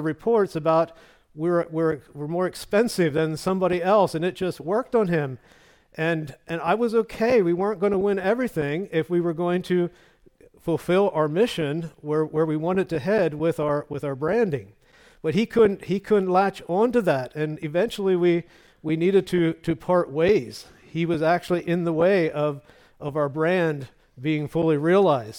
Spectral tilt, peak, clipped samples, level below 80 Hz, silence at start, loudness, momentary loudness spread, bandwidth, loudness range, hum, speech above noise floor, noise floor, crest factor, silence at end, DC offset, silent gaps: -7 dB/octave; -8 dBFS; under 0.1%; -56 dBFS; 0 s; -23 LUFS; 9 LU; 18 kHz; 2 LU; none; 32 dB; -55 dBFS; 16 dB; 0 s; under 0.1%; none